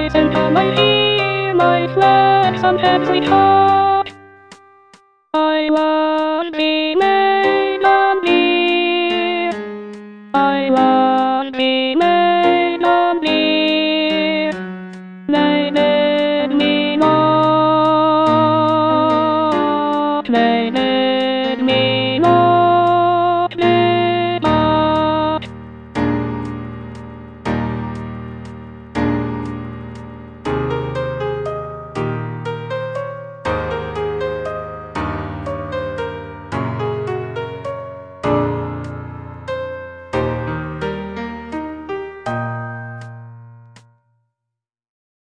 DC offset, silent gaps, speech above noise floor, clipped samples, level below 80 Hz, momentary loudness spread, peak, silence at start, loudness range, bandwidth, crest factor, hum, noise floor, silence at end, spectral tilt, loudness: under 0.1%; none; 69 dB; under 0.1%; -42 dBFS; 16 LU; 0 dBFS; 0 s; 11 LU; 9.2 kHz; 16 dB; none; -81 dBFS; 1.7 s; -7 dB/octave; -16 LUFS